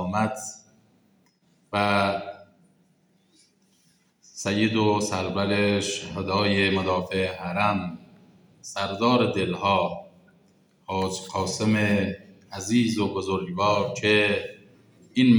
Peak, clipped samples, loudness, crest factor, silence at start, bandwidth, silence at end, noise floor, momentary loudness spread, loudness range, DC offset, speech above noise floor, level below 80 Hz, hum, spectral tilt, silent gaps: -8 dBFS; under 0.1%; -25 LUFS; 18 dB; 0 s; over 20 kHz; 0 s; -64 dBFS; 14 LU; 6 LU; under 0.1%; 40 dB; -62 dBFS; none; -5 dB/octave; none